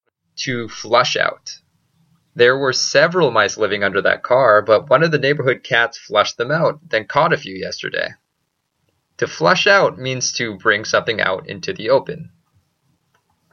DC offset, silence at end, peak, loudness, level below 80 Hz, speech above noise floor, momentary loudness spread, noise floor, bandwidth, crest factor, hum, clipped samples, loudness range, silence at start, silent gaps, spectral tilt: under 0.1%; 1.25 s; 0 dBFS; -17 LUFS; -60 dBFS; 55 dB; 12 LU; -72 dBFS; 7.4 kHz; 18 dB; none; under 0.1%; 5 LU; 0.35 s; none; -3.5 dB/octave